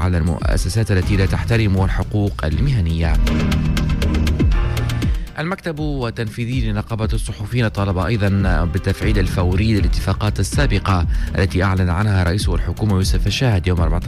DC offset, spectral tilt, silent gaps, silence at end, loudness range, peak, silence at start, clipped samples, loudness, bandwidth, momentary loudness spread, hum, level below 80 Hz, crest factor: under 0.1%; -6.5 dB/octave; none; 0 s; 3 LU; -6 dBFS; 0 s; under 0.1%; -19 LUFS; 15 kHz; 5 LU; none; -22 dBFS; 10 dB